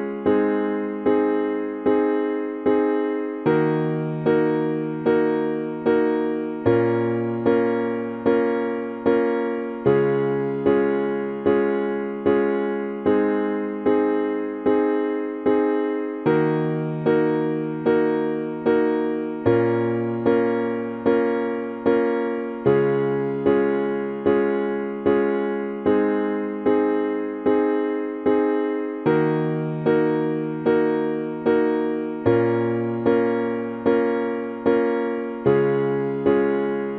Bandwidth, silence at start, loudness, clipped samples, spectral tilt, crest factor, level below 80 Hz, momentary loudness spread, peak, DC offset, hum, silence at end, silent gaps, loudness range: 4.6 kHz; 0 s; -22 LUFS; under 0.1%; -10.5 dB/octave; 16 dB; -60 dBFS; 5 LU; -6 dBFS; under 0.1%; none; 0 s; none; 1 LU